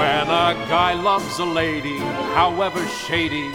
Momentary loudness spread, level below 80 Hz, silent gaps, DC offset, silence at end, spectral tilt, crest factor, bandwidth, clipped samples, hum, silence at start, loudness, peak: 6 LU; -46 dBFS; none; under 0.1%; 0 s; -4.5 dB/octave; 18 dB; 17.5 kHz; under 0.1%; none; 0 s; -20 LUFS; -4 dBFS